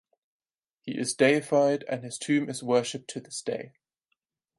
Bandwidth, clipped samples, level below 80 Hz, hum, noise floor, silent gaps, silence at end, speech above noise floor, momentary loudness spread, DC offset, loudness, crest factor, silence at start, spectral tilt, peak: 11.5 kHz; under 0.1%; -78 dBFS; none; -80 dBFS; none; 0.9 s; 53 dB; 14 LU; under 0.1%; -27 LUFS; 20 dB; 0.85 s; -4.5 dB/octave; -8 dBFS